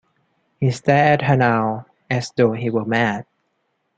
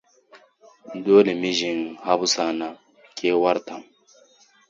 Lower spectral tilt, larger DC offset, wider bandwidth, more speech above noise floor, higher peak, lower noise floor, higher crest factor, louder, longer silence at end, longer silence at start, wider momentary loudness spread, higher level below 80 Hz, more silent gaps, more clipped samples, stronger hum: first, -7 dB/octave vs -3.5 dB/octave; neither; first, 9 kHz vs 7.6 kHz; first, 52 dB vs 35 dB; about the same, -2 dBFS vs -4 dBFS; first, -70 dBFS vs -56 dBFS; about the same, 18 dB vs 20 dB; about the same, -19 LUFS vs -21 LUFS; second, 0.75 s vs 0.9 s; first, 0.6 s vs 0.35 s; second, 10 LU vs 21 LU; first, -54 dBFS vs -72 dBFS; neither; neither; neither